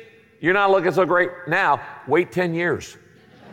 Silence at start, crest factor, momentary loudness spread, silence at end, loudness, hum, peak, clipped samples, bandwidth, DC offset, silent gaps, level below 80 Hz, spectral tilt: 0 s; 16 dB; 7 LU; 0 s; -20 LUFS; none; -6 dBFS; under 0.1%; 16 kHz; under 0.1%; none; -60 dBFS; -6 dB/octave